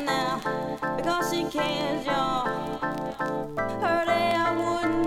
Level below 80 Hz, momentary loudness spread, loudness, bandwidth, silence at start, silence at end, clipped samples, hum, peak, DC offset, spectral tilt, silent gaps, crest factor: -50 dBFS; 7 LU; -27 LUFS; 16.5 kHz; 0 s; 0 s; under 0.1%; none; -12 dBFS; under 0.1%; -4.5 dB/octave; none; 14 dB